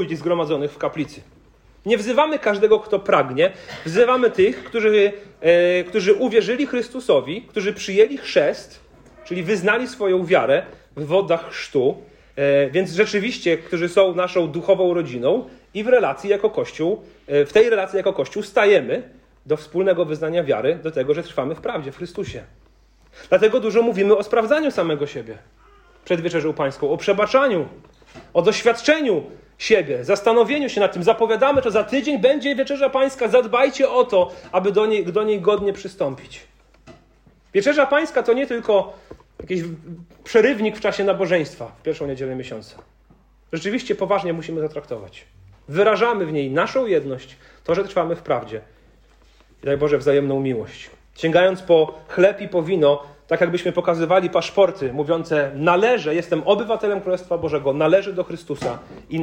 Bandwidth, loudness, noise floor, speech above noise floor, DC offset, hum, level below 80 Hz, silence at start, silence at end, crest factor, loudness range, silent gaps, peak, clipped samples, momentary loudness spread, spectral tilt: 10 kHz; -19 LUFS; -54 dBFS; 35 dB; under 0.1%; none; -54 dBFS; 0 s; 0 s; 16 dB; 5 LU; none; -4 dBFS; under 0.1%; 12 LU; -5.5 dB/octave